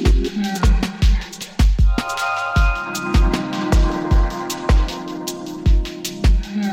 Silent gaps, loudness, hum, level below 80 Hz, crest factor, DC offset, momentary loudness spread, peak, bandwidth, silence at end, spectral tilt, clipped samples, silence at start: none; -20 LUFS; none; -18 dBFS; 14 dB; under 0.1%; 7 LU; -4 dBFS; 16 kHz; 0 s; -5.5 dB/octave; under 0.1%; 0 s